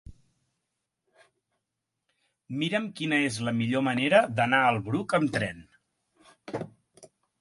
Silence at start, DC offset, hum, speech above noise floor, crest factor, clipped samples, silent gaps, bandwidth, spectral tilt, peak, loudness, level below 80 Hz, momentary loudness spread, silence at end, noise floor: 0.1 s; under 0.1%; none; 58 dB; 22 dB; under 0.1%; none; 11.5 kHz; -5.5 dB/octave; -8 dBFS; -26 LUFS; -62 dBFS; 16 LU; 0.35 s; -84 dBFS